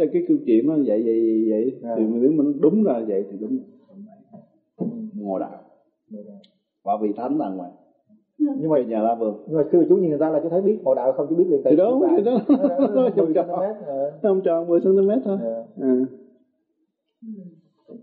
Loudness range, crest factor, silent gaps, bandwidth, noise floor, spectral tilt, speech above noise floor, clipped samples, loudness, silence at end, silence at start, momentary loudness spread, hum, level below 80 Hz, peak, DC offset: 11 LU; 16 dB; none; 4.3 kHz; -73 dBFS; -9.5 dB/octave; 53 dB; under 0.1%; -21 LUFS; 0.05 s; 0 s; 12 LU; none; -76 dBFS; -6 dBFS; under 0.1%